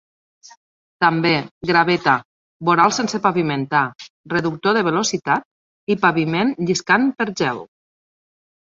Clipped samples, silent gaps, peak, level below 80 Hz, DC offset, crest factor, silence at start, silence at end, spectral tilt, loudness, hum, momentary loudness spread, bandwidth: under 0.1%; 1.51-1.61 s, 2.25-2.60 s, 4.10-4.24 s, 5.45-5.87 s; -2 dBFS; -60 dBFS; under 0.1%; 18 dB; 1 s; 1 s; -4.5 dB/octave; -19 LUFS; none; 7 LU; 7.8 kHz